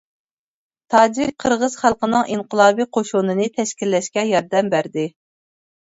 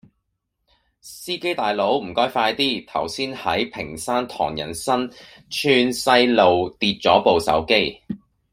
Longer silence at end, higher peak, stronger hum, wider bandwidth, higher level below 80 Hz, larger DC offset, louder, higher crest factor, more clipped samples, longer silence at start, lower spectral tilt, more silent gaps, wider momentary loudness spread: first, 0.85 s vs 0.35 s; about the same, 0 dBFS vs -2 dBFS; neither; second, 8 kHz vs 16 kHz; about the same, -58 dBFS vs -54 dBFS; neither; about the same, -19 LUFS vs -20 LUFS; about the same, 18 dB vs 20 dB; neither; second, 0.9 s vs 1.05 s; about the same, -4.5 dB/octave vs -4 dB/octave; neither; second, 7 LU vs 13 LU